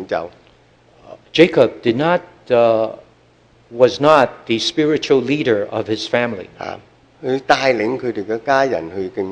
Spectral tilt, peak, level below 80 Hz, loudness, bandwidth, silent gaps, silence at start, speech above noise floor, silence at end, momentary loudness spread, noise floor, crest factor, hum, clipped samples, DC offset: -5 dB/octave; 0 dBFS; -56 dBFS; -17 LUFS; 9.8 kHz; none; 0 s; 35 dB; 0 s; 14 LU; -52 dBFS; 18 dB; none; 0.1%; under 0.1%